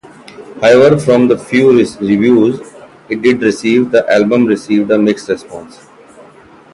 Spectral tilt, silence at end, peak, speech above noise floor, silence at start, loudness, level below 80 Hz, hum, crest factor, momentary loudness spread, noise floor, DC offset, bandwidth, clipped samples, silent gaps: -6.5 dB/octave; 1.05 s; 0 dBFS; 30 dB; 0.4 s; -11 LUFS; -50 dBFS; none; 12 dB; 12 LU; -40 dBFS; under 0.1%; 11.5 kHz; under 0.1%; none